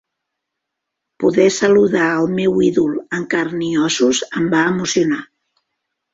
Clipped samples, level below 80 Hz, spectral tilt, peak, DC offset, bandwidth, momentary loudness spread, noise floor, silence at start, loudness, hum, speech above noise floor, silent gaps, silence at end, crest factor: under 0.1%; -54 dBFS; -4.5 dB/octave; -2 dBFS; under 0.1%; 8 kHz; 7 LU; -79 dBFS; 1.2 s; -16 LUFS; none; 63 dB; none; 0.9 s; 16 dB